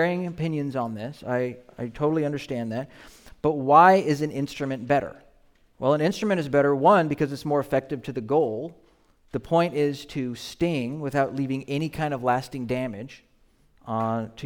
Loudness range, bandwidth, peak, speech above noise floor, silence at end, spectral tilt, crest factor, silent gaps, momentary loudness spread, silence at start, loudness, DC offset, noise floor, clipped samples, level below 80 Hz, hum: 6 LU; 18.5 kHz; -4 dBFS; 36 dB; 0 s; -7 dB/octave; 22 dB; none; 14 LU; 0 s; -25 LUFS; under 0.1%; -61 dBFS; under 0.1%; -56 dBFS; none